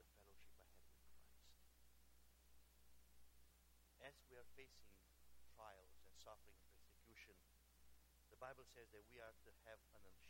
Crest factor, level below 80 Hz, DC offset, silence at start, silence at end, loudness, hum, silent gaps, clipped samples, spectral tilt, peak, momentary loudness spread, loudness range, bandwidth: 24 dB; -76 dBFS; under 0.1%; 0 s; 0 s; -65 LUFS; none; none; under 0.1%; -3.5 dB/octave; -42 dBFS; 7 LU; 4 LU; 16.5 kHz